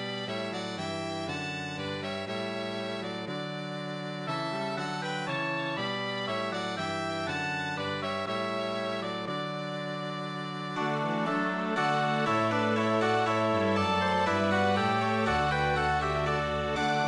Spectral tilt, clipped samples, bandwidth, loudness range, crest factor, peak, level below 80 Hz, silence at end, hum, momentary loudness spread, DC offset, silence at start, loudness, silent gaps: -5.5 dB/octave; under 0.1%; 12 kHz; 7 LU; 16 dB; -14 dBFS; -54 dBFS; 0 s; none; 8 LU; under 0.1%; 0 s; -30 LUFS; none